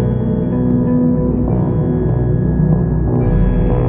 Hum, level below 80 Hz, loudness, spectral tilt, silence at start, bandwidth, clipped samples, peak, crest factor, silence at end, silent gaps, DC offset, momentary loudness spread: none; -22 dBFS; -15 LUFS; -14.5 dB/octave; 0 s; 3.5 kHz; under 0.1%; -2 dBFS; 12 dB; 0 s; none; under 0.1%; 2 LU